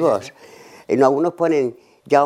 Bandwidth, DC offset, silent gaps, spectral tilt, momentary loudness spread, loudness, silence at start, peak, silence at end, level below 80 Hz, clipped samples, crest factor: 12.5 kHz; under 0.1%; none; -6.5 dB/octave; 9 LU; -19 LUFS; 0 s; -2 dBFS; 0 s; -68 dBFS; under 0.1%; 18 dB